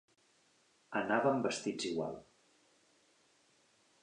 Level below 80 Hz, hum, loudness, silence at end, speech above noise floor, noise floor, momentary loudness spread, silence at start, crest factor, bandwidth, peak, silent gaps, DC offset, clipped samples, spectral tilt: -78 dBFS; none; -36 LUFS; 1.8 s; 37 dB; -72 dBFS; 11 LU; 0.9 s; 22 dB; 10.5 kHz; -16 dBFS; none; under 0.1%; under 0.1%; -4.5 dB/octave